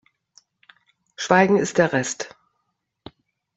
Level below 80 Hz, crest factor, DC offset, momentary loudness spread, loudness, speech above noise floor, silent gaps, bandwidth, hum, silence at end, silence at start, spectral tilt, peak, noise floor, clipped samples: -62 dBFS; 22 dB; under 0.1%; 16 LU; -20 LUFS; 56 dB; none; 8.2 kHz; none; 1.3 s; 1.2 s; -4.5 dB/octave; -2 dBFS; -76 dBFS; under 0.1%